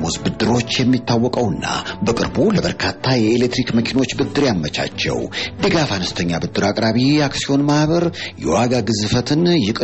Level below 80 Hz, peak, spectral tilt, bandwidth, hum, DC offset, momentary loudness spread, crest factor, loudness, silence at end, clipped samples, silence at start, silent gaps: -42 dBFS; -6 dBFS; -5 dB/octave; 8.4 kHz; none; 0.4%; 5 LU; 12 dB; -18 LUFS; 0 s; under 0.1%; 0 s; none